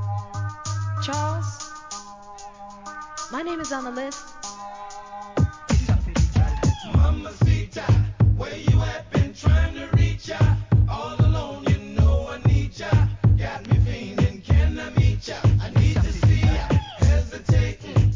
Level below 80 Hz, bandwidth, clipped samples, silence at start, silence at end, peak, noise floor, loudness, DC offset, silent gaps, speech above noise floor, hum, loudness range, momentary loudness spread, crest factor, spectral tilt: -26 dBFS; 7.6 kHz; under 0.1%; 0 s; 0 s; -6 dBFS; -41 dBFS; -22 LUFS; under 0.1%; none; 13 dB; none; 9 LU; 15 LU; 16 dB; -6.5 dB/octave